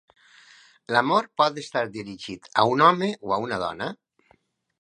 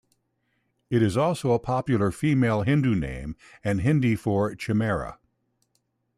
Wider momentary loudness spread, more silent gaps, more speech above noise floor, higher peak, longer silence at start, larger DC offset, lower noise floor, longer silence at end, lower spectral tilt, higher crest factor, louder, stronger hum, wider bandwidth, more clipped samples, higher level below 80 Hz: first, 16 LU vs 10 LU; neither; second, 40 dB vs 50 dB; first, -2 dBFS vs -10 dBFS; about the same, 0.9 s vs 0.9 s; neither; second, -64 dBFS vs -73 dBFS; second, 0.9 s vs 1.05 s; second, -5 dB/octave vs -7.5 dB/octave; first, 24 dB vs 14 dB; about the same, -23 LUFS vs -25 LUFS; neither; second, 11 kHz vs 14 kHz; neither; second, -64 dBFS vs -48 dBFS